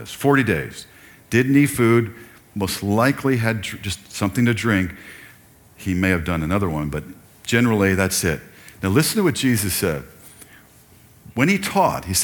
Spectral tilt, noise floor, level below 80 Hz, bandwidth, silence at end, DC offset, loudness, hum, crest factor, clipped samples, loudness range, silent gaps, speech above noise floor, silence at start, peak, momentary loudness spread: -5 dB/octave; -50 dBFS; -44 dBFS; 19 kHz; 0 s; under 0.1%; -20 LUFS; none; 18 dB; under 0.1%; 3 LU; none; 30 dB; 0 s; -2 dBFS; 13 LU